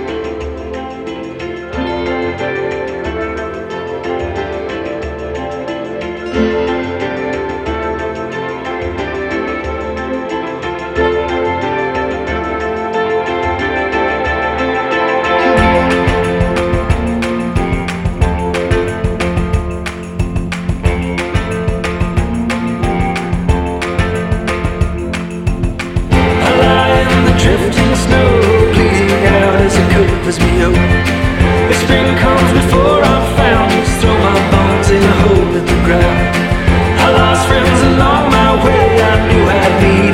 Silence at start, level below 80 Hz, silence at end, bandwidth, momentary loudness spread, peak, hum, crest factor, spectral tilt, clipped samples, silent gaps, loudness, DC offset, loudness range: 0 s; -22 dBFS; 0 s; 15.5 kHz; 11 LU; 0 dBFS; none; 12 dB; -6 dB/octave; under 0.1%; none; -13 LUFS; under 0.1%; 9 LU